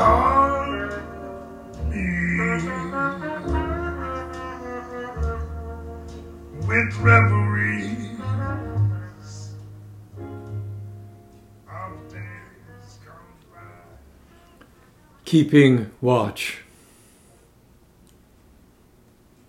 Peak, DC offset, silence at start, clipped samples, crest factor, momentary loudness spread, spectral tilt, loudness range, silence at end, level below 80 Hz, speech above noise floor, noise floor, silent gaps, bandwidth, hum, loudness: -2 dBFS; under 0.1%; 0 s; under 0.1%; 22 dB; 23 LU; -7 dB/octave; 17 LU; 2.85 s; -40 dBFS; 38 dB; -55 dBFS; none; 13.5 kHz; none; -22 LUFS